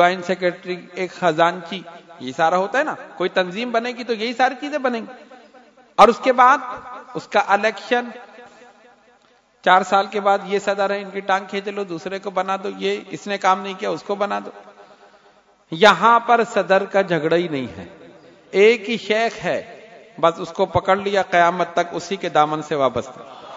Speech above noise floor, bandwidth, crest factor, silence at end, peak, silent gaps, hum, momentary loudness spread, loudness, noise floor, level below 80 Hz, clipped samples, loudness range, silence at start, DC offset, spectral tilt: 37 dB; 12 kHz; 20 dB; 0 s; 0 dBFS; none; none; 16 LU; -19 LUFS; -57 dBFS; -60 dBFS; under 0.1%; 5 LU; 0 s; under 0.1%; -4.5 dB/octave